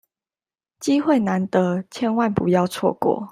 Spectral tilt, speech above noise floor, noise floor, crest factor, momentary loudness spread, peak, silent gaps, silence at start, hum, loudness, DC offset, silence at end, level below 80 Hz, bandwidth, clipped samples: -6.5 dB/octave; over 70 dB; under -90 dBFS; 18 dB; 5 LU; -4 dBFS; none; 0.8 s; none; -21 LUFS; under 0.1%; 0 s; -60 dBFS; 15.5 kHz; under 0.1%